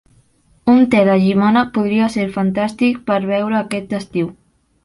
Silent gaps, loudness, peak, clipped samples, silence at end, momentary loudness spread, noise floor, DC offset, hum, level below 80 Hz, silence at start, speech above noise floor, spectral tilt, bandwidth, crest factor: none; -16 LUFS; -2 dBFS; under 0.1%; 0.55 s; 10 LU; -54 dBFS; under 0.1%; none; -52 dBFS; 0.65 s; 39 dB; -7 dB/octave; 11.5 kHz; 14 dB